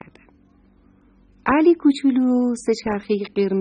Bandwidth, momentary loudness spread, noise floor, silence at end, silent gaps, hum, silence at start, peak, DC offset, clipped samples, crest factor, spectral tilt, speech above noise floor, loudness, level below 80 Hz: 10 kHz; 8 LU; -55 dBFS; 0 s; none; none; 1.45 s; -6 dBFS; under 0.1%; under 0.1%; 16 dB; -6 dB/octave; 36 dB; -19 LUFS; -54 dBFS